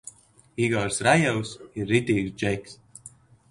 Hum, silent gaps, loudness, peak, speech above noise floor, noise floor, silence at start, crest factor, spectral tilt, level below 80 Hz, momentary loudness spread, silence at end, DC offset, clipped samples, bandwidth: none; none; -25 LUFS; -6 dBFS; 26 dB; -51 dBFS; 0.05 s; 22 dB; -5 dB/octave; -54 dBFS; 24 LU; 0.45 s; under 0.1%; under 0.1%; 11.5 kHz